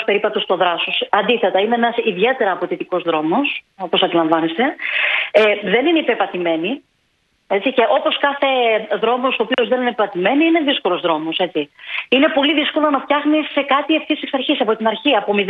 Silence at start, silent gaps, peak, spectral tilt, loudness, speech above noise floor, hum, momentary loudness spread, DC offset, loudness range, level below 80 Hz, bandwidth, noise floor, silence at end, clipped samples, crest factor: 0 s; none; 0 dBFS; -6.5 dB/octave; -17 LUFS; 47 dB; none; 5 LU; under 0.1%; 1 LU; -66 dBFS; 5.8 kHz; -64 dBFS; 0 s; under 0.1%; 16 dB